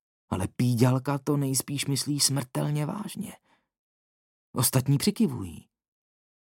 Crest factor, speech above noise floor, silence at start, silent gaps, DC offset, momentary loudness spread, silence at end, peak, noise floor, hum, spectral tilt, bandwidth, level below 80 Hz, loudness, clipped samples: 20 dB; over 63 dB; 0.3 s; 3.79-4.53 s; under 0.1%; 13 LU; 0.85 s; -8 dBFS; under -90 dBFS; none; -5 dB/octave; 17 kHz; -64 dBFS; -27 LUFS; under 0.1%